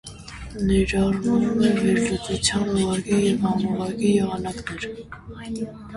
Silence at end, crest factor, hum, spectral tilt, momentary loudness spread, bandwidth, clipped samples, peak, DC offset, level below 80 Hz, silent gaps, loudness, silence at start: 0 s; 16 dB; none; -5 dB/octave; 15 LU; 11.5 kHz; under 0.1%; -6 dBFS; under 0.1%; -40 dBFS; none; -22 LUFS; 0.05 s